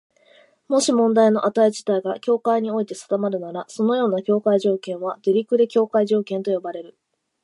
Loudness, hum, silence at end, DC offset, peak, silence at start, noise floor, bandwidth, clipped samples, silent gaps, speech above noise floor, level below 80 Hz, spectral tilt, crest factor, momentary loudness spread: -21 LUFS; none; 0.55 s; under 0.1%; -6 dBFS; 0.7 s; -55 dBFS; 11.5 kHz; under 0.1%; none; 35 dB; -78 dBFS; -5.5 dB/octave; 16 dB; 9 LU